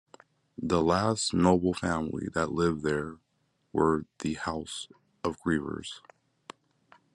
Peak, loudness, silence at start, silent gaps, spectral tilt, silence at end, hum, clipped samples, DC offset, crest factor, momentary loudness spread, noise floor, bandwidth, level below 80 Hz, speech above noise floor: -10 dBFS; -29 LUFS; 0.6 s; none; -5.5 dB/octave; 1.15 s; none; under 0.1%; under 0.1%; 22 dB; 15 LU; -74 dBFS; 11.5 kHz; -58 dBFS; 45 dB